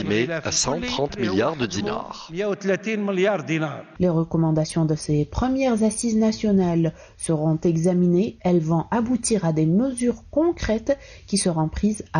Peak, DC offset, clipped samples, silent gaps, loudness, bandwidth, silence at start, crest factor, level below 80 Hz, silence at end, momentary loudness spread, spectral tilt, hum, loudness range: -10 dBFS; under 0.1%; under 0.1%; none; -22 LUFS; 10 kHz; 0 s; 12 dB; -42 dBFS; 0 s; 6 LU; -5.5 dB/octave; none; 3 LU